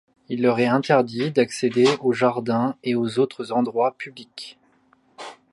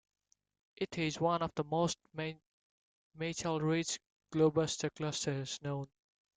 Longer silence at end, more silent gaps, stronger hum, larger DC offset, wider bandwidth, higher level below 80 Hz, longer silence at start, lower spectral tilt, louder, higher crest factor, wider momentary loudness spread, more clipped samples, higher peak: second, 0.2 s vs 0.5 s; second, none vs 2.46-3.11 s, 4.12-4.20 s; neither; neither; first, 11.5 kHz vs 9.6 kHz; about the same, -70 dBFS vs -70 dBFS; second, 0.3 s vs 0.8 s; about the same, -6 dB/octave vs -5 dB/octave; first, -21 LUFS vs -36 LUFS; about the same, 18 dB vs 18 dB; first, 19 LU vs 11 LU; neither; first, -4 dBFS vs -18 dBFS